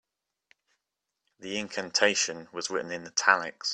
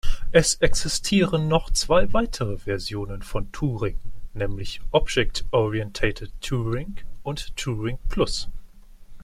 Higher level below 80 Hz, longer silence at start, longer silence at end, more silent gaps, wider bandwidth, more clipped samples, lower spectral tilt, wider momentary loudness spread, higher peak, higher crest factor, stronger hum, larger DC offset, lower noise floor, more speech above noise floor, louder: second, -76 dBFS vs -30 dBFS; first, 1.4 s vs 0.05 s; about the same, 0 s vs 0 s; neither; second, 10.5 kHz vs 13 kHz; neither; second, -1 dB/octave vs -4.5 dB/octave; about the same, 12 LU vs 12 LU; about the same, -4 dBFS vs -4 dBFS; first, 26 dB vs 20 dB; neither; neither; first, -85 dBFS vs -43 dBFS; first, 56 dB vs 21 dB; about the same, -27 LUFS vs -25 LUFS